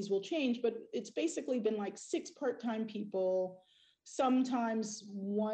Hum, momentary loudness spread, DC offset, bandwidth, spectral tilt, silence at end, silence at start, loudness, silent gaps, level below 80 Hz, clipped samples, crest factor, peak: none; 9 LU; under 0.1%; 9.2 kHz; -5 dB/octave; 0 s; 0 s; -36 LUFS; none; -84 dBFS; under 0.1%; 12 dB; -24 dBFS